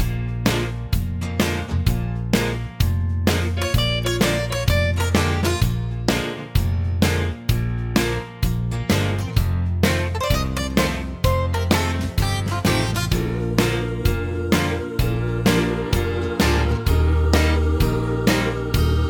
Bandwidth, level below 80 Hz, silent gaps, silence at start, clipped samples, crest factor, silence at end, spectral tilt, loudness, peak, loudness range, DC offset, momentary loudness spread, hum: 19.5 kHz; -26 dBFS; none; 0 s; under 0.1%; 18 dB; 0 s; -5.5 dB/octave; -21 LUFS; -2 dBFS; 2 LU; under 0.1%; 4 LU; none